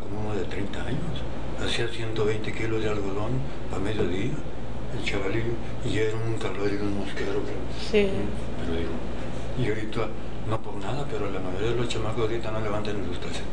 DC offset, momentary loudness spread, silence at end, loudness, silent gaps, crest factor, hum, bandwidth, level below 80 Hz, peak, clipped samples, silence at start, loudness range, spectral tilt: 6%; 6 LU; 0 s; -30 LUFS; none; 20 dB; none; 10 kHz; -38 dBFS; -8 dBFS; under 0.1%; 0 s; 2 LU; -6 dB/octave